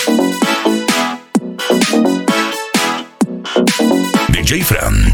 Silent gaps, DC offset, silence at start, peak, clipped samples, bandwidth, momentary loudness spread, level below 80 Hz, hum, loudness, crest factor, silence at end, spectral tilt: none; under 0.1%; 0 s; 0 dBFS; under 0.1%; 19 kHz; 6 LU; -24 dBFS; none; -14 LUFS; 14 dB; 0 s; -4 dB/octave